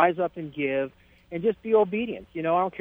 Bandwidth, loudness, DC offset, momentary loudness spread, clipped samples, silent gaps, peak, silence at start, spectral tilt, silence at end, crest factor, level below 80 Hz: 3.8 kHz; -27 LUFS; under 0.1%; 9 LU; under 0.1%; none; -6 dBFS; 0 s; -9 dB/octave; 0 s; 20 dB; -62 dBFS